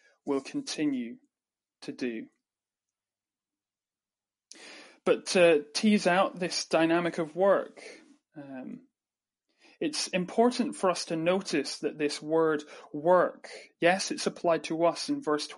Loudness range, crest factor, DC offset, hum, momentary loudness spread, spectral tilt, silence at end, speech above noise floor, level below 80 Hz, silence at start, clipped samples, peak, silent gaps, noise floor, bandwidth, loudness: 14 LU; 20 dB; under 0.1%; none; 20 LU; -4 dB/octave; 0 s; over 62 dB; -82 dBFS; 0.25 s; under 0.1%; -10 dBFS; none; under -90 dBFS; 11.5 kHz; -28 LUFS